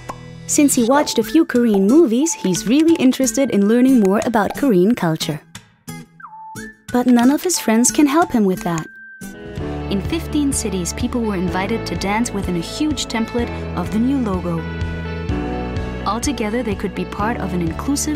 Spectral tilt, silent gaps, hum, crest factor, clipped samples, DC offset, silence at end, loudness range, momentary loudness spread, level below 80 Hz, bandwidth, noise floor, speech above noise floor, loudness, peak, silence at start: -5 dB/octave; none; none; 16 dB; under 0.1%; under 0.1%; 0 s; 7 LU; 17 LU; -36 dBFS; 16 kHz; -37 dBFS; 21 dB; -18 LUFS; -2 dBFS; 0 s